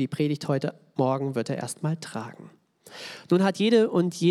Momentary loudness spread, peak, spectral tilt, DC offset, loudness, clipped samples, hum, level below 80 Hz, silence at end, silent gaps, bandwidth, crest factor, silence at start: 18 LU; -8 dBFS; -6 dB/octave; under 0.1%; -26 LUFS; under 0.1%; none; -80 dBFS; 0 s; none; 14 kHz; 16 dB; 0 s